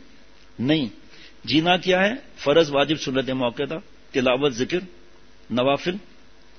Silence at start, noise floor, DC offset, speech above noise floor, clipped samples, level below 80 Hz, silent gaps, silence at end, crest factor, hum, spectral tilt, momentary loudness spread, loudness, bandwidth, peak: 0.6 s; -52 dBFS; 0.5%; 31 dB; under 0.1%; -54 dBFS; none; 0.6 s; 18 dB; none; -5 dB/octave; 11 LU; -22 LUFS; 6.6 kHz; -4 dBFS